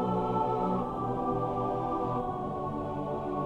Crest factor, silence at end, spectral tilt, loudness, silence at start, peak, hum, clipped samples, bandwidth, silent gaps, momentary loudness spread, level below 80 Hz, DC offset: 12 dB; 0 s; -9.5 dB/octave; -32 LUFS; 0 s; -18 dBFS; none; under 0.1%; 10 kHz; none; 5 LU; -50 dBFS; under 0.1%